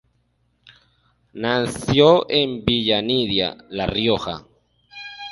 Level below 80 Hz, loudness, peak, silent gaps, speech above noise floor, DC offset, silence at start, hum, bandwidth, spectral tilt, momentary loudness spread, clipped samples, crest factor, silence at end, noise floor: -46 dBFS; -19 LUFS; 0 dBFS; none; 47 dB; under 0.1%; 0.65 s; 60 Hz at -45 dBFS; 11.5 kHz; -5.5 dB/octave; 18 LU; under 0.1%; 20 dB; 0 s; -66 dBFS